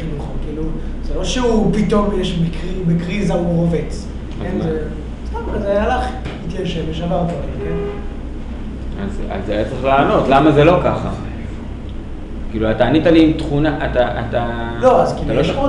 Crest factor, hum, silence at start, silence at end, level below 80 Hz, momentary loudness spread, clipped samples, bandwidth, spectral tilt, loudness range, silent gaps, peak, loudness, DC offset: 16 dB; none; 0 s; 0 s; -26 dBFS; 16 LU; under 0.1%; 11 kHz; -7 dB/octave; 6 LU; none; 0 dBFS; -17 LUFS; under 0.1%